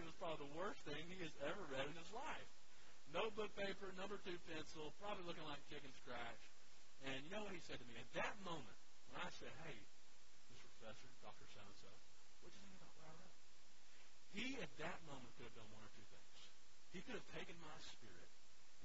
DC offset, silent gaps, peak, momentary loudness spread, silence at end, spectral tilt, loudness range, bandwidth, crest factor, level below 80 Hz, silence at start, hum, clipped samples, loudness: 0.4%; none; -30 dBFS; 19 LU; 0 s; -2.5 dB/octave; 13 LU; 7.6 kHz; 24 dB; -74 dBFS; 0 s; none; under 0.1%; -53 LUFS